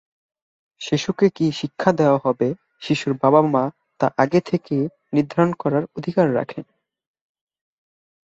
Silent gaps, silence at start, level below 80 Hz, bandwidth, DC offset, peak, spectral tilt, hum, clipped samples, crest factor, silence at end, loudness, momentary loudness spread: none; 0.8 s; -62 dBFS; 7.8 kHz; under 0.1%; -2 dBFS; -7 dB/octave; none; under 0.1%; 20 dB; 1.65 s; -20 LUFS; 8 LU